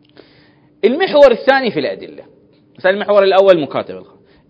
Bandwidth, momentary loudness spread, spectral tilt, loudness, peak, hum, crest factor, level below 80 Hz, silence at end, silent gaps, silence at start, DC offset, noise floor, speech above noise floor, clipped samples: 8 kHz; 15 LU; -6 dB/octave; -13 LUFS; 0 dBFS; none; 14 dB; -52 dBFS; 0.5 s; none; 0.85 s; under 0.1%; -49 dBFS; 37 dB; 0.5%